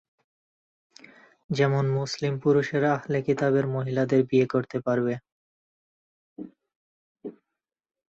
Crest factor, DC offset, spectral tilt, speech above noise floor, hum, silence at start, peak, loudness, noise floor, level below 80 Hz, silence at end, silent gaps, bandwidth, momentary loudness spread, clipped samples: 18 dB; under 0.1%; -7 dB/octave; 63 dB; none; 1.5 s; -10 dBFS; -25 LUFS; -87 dBFS; -66 dBFS; 0.8 s; 5.32-6.36 s, 6.76-7.15 s; 8 kHz; 20 LU; under 0.1%